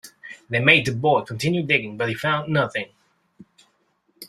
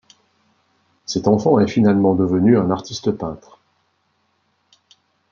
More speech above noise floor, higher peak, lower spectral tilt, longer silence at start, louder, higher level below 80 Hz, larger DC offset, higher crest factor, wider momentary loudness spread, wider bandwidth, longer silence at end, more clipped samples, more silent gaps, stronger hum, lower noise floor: second, 46 dB vs 50 dB; about the same, -2 dBFS vs -2 dBFS; second, -5 dB/octave vs -7 dB/octave; second, 0.05 s vs 1.1 s; second, -20 LUFS vs -17 LUFS; about the same, -58 dBFS vs -56 dBFS; neither; about the same, 22 dB vs 18 dB; about the same, 16 LU vs 14 LU; first, 15 kHz vs 7.4 kHz; second, 0 s vs 1.95 s; neither; neither; neither; about the same, -67 dBFS vs -66 dBFS